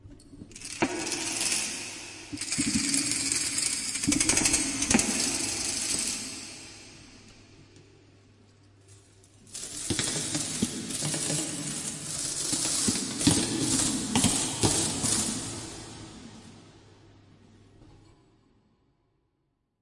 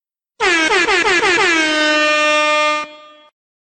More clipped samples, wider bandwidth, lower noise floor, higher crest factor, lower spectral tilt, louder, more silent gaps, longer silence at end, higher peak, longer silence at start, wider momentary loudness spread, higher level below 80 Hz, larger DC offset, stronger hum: neither; first, 11.5 kHz vs 9.4 kHz; first, -76 dBFS vs -37 dBFS; first, 24 dB vs 12 dB; about the same, -2 dB/octave vs -1 dB/octave; second, -27 LUFS vs -13 LUFS; neither; first, 1.9 s vs 0.65 s; about the same, -6 dBFS vs -4 dBFS; second, 0.05 s vs 0.4 s; first, 17 LU vs 5 LU; about the same, -54 dBFS vs -50 dBFS; neither; neither